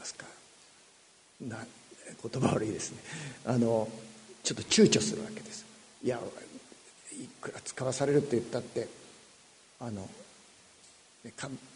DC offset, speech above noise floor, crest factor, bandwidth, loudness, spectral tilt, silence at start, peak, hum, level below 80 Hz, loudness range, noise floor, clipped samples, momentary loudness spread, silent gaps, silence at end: under 0.1%; 29 dB; 24 dB; 10.5 kHz; -32 LUFS; -4.5 dB/octave; 0 s; -10 dBFS; none; -68 dBFS; 8 LU; -61 dBFS; under 0.1%; 23 LU; none; 0 s